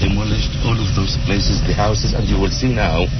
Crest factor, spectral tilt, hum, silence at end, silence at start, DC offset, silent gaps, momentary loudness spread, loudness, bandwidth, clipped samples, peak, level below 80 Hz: 12 dB; -5.5 dB/octave; none; 0 s; 0 s; 0.5%; none; 2 LU; -18 LUFS; 6.4 kHz; under 0.1%; -4 dBFS; -20 dBFS